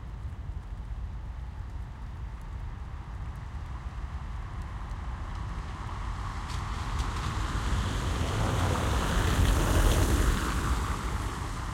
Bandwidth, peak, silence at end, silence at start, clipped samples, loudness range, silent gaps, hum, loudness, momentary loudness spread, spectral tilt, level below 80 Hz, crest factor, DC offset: 16.5 kHz; -12 dBFS; 0 s; 0 s; under 0.1%; 13 LU; none; none; -32 LUFS; 15 LU; -5 dB/octave; -34 dBFS; 18 dB; under 0.1%